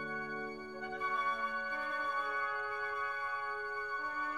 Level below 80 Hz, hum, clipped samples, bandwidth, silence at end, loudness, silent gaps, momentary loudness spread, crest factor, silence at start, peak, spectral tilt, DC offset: -72 dBFS; none; under 0.1%; 13 kHz; 0 s; -37 LUFS; none; 6 LU; 14 dB; 0 s; -24 dBFS; -4 dB/octave; under 0.1%